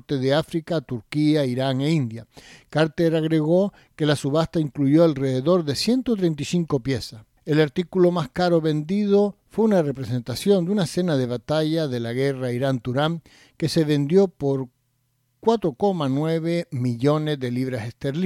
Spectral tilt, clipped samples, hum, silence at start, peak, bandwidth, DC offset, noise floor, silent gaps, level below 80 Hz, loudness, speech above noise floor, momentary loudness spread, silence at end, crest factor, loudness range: -7 dB/octave; under 0.1%; none; 0.1 s; -6 dBFS; 15 kHz; under 0.1%; -69 dBFS; none; -56 dBFS; -22 LUFS; 47 dB; 8 LU; 0 s; 16 dB; 3 LU